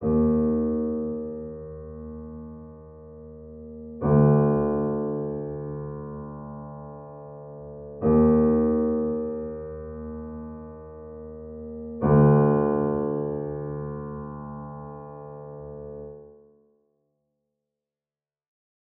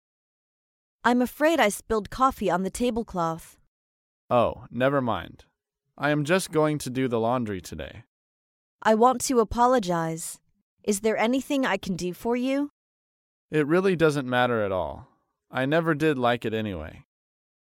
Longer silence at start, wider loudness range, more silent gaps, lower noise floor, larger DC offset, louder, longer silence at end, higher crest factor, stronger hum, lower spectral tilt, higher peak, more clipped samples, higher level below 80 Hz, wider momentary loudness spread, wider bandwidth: second, 0 s vs 1.05 s; first, 16 LU vs 3 LU; second, none vs 3.67-4.29 s, 8.07-8.79 s, 10.62-10.77 s, 12.70-13.49 s; first, under -90 dBFS vs -62 dBFS; neither; about the same, -24 LUFS vs -25 LUFS; first, 2.65 s vs 0.75 s; about the same, 20 dB vs 18 dB; neither; first, -14.5 dB/octave vs -5 dB/octave; about the same, -6 dBFS vs -8 dBFS; neither; first, -46 dBFS vs -52 dBFS; first, 22 LU vs 13 LU; second, 2.6 kHz vs 16.5 kHz